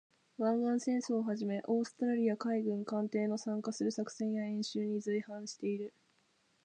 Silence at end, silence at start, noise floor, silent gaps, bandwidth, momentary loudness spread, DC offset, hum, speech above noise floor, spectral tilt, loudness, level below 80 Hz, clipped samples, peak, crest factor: 0.75 s; 0.4 s; -74 dBFS; none; 9.6 kHz; 6 LU; under 0.1%; none; 39 dB; -6 dB/octave; -36 LUFS; -88 dBFS; under 0.1%; -20 dBFS; 16 dB